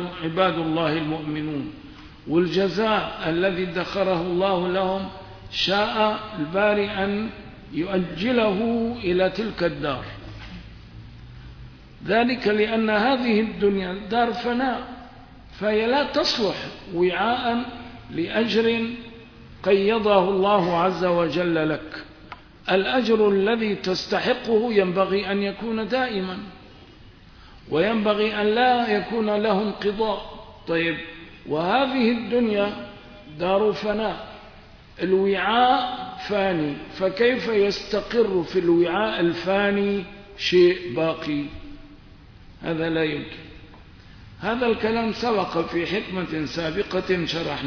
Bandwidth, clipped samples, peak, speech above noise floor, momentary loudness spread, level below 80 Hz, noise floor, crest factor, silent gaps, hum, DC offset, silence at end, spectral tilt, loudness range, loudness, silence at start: 5.4 kHz; under 0.1%; -4 dBFS; 25 dB; 17 LU; -48 dBFS; -47 dBFS; 18 dB; none; none; under 0.1%; 0 s; -6 dB/octave; 4 LU; -23 LUFS; 0 s